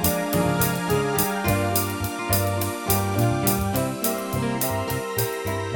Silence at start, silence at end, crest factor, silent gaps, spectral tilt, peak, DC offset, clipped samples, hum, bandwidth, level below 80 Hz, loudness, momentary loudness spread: 0 s; 0 s; 18 dB; none; -4.5 dB/octave; -4 dBFS; under 0.1%; under 0.1%; none; 19.5 kHz; -42 dBFS; -23 LUFS; 5 LU